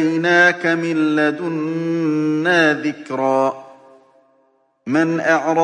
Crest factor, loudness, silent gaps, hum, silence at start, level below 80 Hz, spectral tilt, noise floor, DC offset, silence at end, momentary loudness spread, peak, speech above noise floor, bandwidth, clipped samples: 16 dB; -17 LUFS; none; none; 0 s; -72 dBFS; -5.5 dB/octave; -60 dBFS; under 0.1%; 0 s; 9 LU; -2 dBFS; 43 dB; 9.8 kHz; under 0.1%